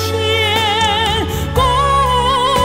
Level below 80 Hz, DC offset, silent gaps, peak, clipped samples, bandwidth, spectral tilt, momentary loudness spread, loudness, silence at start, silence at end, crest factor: -26 dBFS; under 0.1%; none; 0 dBFS; under 0.1%; 16.5 kHz; -4 dB/octave; 3 LU; -14 LUFS; 0 s; 0 s; 14 dB